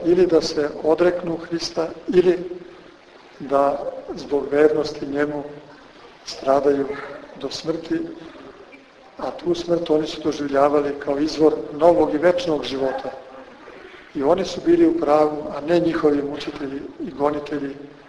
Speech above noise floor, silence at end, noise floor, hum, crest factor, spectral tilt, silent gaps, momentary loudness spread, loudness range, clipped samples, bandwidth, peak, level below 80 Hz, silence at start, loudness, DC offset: 26 dB; 0.15 s; -46 dBFS; none; 20 dB; -5.5 dB/octave; none; 17 LU; 6 LU; under 0.1%; 10.5 kHz; -2 dBFS; -52 dBFS; 0 s; -21 LUFS; under 0.1%